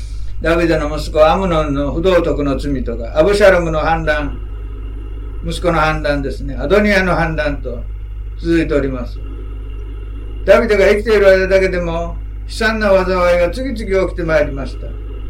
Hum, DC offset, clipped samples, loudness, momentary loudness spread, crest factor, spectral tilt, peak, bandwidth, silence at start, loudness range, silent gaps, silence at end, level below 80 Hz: none; under 0.1%; under 0.1%; -15 LUFS; 18 LU; 14 dB; -6 dB/octave; 0 dBFS; 15 kHz; 0 s; 4 LU; none; 0 s; -24 dBFS